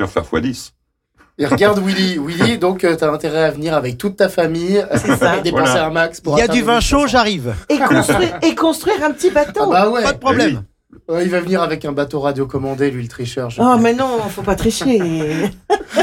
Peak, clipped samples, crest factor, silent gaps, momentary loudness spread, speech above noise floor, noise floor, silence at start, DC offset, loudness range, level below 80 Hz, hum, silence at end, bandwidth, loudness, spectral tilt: -4 dBFS; under 0.1%; 12 dB; none; 7 LU; 40 dB; -55 dBFS; 0 s; under 0.1%; 3 LU; -36 dBFS; none; 0 s; 17 kHz; -16 LUFS; -5 dB/octave